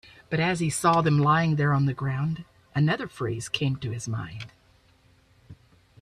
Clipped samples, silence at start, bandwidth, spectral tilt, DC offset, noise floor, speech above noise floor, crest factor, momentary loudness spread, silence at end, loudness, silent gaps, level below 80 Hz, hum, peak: under 0.1%; 0.3 s; 13.5 kHz; -5.5 dB/octave; under 0.1%; -60 dBFS; 35 dB; 20 dB; 12 LU; 0.5 s; -25 LUFS; none; -58 dBFS; none; -6 dBFS